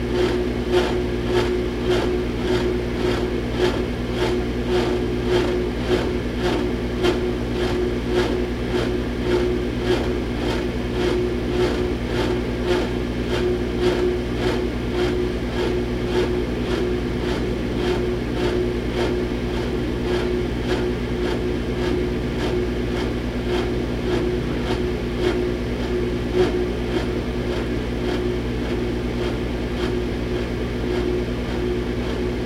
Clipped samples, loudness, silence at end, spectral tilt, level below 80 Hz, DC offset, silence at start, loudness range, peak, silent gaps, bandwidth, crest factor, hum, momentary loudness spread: under 0.1%; -23 LUFS; 0 s; -6.5 dB/octave; -30 dBFS; under 0.1%; 0 s; 2 LU; -6 dBFS; none; 14 kHz; 16 dB; 60 Hz at -25 dBFS; 3 LU